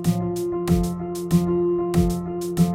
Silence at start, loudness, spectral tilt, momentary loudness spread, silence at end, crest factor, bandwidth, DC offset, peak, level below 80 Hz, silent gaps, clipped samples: 0 s; -23 LUFS; -7.5 dB/octave; 6 LU; 0 s; 16 dB; 16 kHz; under 0.1%; -6 dBFS; -36 dBFS; none; under 0.1%